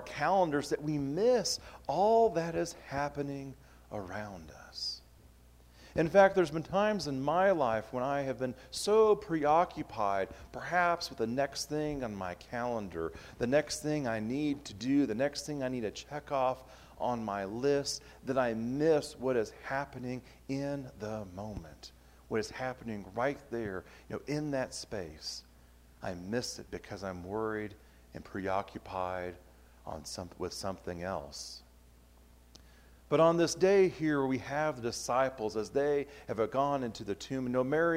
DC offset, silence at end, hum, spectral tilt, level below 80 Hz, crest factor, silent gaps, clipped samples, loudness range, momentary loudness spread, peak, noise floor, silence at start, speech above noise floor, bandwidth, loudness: under 0.1%; 0 s; none; -5 dB/octave; -60 dBFS; 22 dB; none; under 0.1%; 10 LU; 16 LU; -10 dBFS; -59 dBFS; 0 s; 27 dB; 16 kHz; -33 LUFS